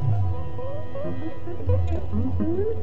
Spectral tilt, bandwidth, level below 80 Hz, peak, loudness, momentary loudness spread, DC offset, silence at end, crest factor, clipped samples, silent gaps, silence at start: -10.5 dB/octave; 4.2 kHz; -36 dBFS; -10 dBFS; -28 LUFS; 9 LU; 7%; 0 s; 14 dB; under 0.1%; none; 0 s